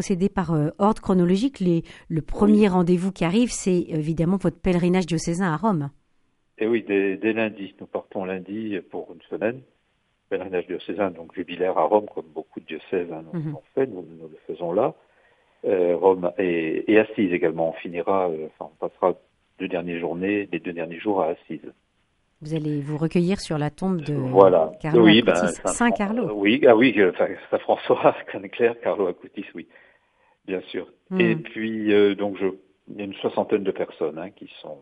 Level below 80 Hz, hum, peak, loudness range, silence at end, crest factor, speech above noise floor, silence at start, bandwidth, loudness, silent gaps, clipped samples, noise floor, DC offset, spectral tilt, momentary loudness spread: -50 dBFS; none; 0 dBFS; 9 LU; 0.05 s; 22 dB; 47 dB; 0 s; 11.5 kHz; -23 LUFS; none; under 0.1%; -69 dBFS; under 0.1%; -6 dB/octave; 17 LU